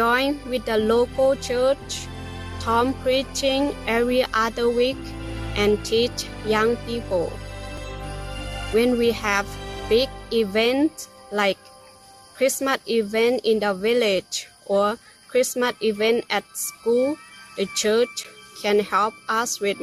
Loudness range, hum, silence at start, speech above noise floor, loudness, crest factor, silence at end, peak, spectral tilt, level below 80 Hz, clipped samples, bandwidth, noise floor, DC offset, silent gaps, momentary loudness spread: 2 LU; none; 0 s; 26 dB; -22 LUFS; 16 dB; 0 s; -6 dBFS; -3.5 dB/octave; -42 dBFS; under 0.1%; 15 kHz; -48 dBFS; under 0.1%; none; 13 LU